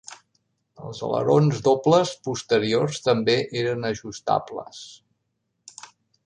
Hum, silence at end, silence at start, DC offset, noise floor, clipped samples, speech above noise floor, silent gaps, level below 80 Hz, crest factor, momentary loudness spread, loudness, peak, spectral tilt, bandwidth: none; 1.3 s; 0.1 s; under 0.1%; -76 dBFS; under 0.1%; 53 dB; none; -62 dBFS; 18 dB; 23 LU; -22 LUFS; -6 dBFS; -5.5 dB/octave; 10 kHz